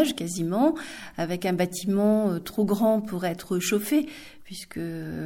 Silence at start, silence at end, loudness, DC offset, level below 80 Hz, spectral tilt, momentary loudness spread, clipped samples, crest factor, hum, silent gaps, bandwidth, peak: 0 s; 0 s; -26 LUFS; under 0.1%; -58 dBFS; -5.5 dB/octave; 14 LU; under 0.1%; 16 dB; none; none; 17 kHz; -8 dBFS